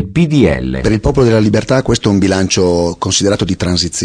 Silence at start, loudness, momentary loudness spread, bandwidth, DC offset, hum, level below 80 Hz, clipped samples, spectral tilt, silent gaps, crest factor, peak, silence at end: 0 s; -12 LUFS; 4 LU; 10.5 kHz; under 0.1%; none; -28 dBFS; under 0.1%; -5 dB/octave; none; 12 dB; 0 dBFS; 0 s